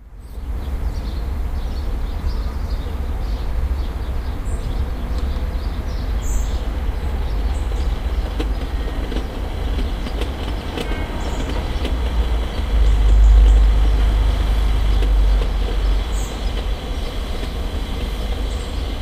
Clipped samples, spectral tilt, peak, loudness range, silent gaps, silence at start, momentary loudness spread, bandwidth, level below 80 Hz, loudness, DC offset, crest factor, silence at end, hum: under 0.1%; -6 dB/octave; -2 dBFS; 8 LU; none; 0 s; 9 LU; 14.5 kHz; -18 dBFS; -23 LUFS; under 0.1%; 16 dB; 0 s; none